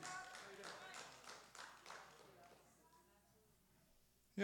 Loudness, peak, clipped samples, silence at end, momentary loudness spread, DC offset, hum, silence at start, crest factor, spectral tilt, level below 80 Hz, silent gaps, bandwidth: -56 LUFS; -28 dBFS; under 0.1%; 0 s; 13 LU; under 0.1%; none; 0 s; 28 dB; -3 dB/octave; -84 dBFS; none; 18 kHz